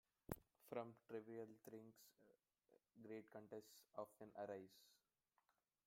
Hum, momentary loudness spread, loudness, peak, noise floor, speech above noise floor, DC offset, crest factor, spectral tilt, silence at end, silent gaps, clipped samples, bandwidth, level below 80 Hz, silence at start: none; 8 LU; -58 LUFS; -30 dBFS; -89 dBFS; 32 dB; under 0.1%; 30 dB; -6 dB/octave; 0.9 s; none; under 0.1%; 16.5 kHz; -82 dBFS; 0.3 s